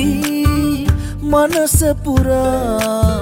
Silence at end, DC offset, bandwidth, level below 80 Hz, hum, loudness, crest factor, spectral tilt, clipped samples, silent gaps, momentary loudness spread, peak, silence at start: 0 s; under 0.1%; 17 kHz; -24 dBFS; none; -15 LUFS; 14 dB; -5.5 dB/octave; under 0.1%; none; 4 LU; -2 dBFS; 0 s